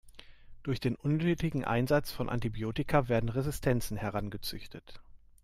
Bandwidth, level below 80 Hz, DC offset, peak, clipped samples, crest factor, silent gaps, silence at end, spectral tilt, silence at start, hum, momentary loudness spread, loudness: 16 kHz; -48 dBFS; under 0.1%; -14 dBFS; under 0.1%; 18 dB; none; 0.25 s; -6.5 dB/octave; 0.05 s; none; 11 LU; -32 LUFS